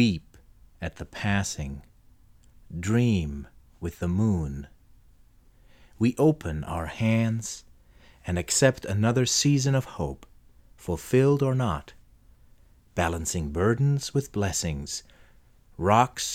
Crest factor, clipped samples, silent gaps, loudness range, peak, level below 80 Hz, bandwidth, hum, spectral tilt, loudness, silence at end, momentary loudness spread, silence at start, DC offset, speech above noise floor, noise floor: 22 dB; under 0.1%; none; 5 LU; -6 dBFS; -48 dBFS; 16 kHz; none; -5 dB/octave; -26 LUFS; 0 s; 16 LU; 0 s; under 0.1%; 31 dB; -56 dBFS